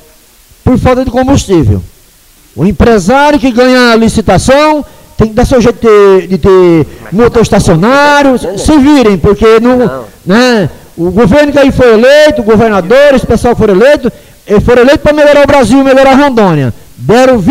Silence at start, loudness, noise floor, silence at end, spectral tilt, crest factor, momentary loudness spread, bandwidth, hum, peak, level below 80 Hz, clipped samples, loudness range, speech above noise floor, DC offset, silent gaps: 0.65 s; -5 LUFS; -40 dBFS; 0 s; -6 dB/octave; 6 dB; 8 LU; 16.5 kHz; none; 0 dBFS; -24 dBFS; 1%; 2 LU; 35 dB; under 0.1%; none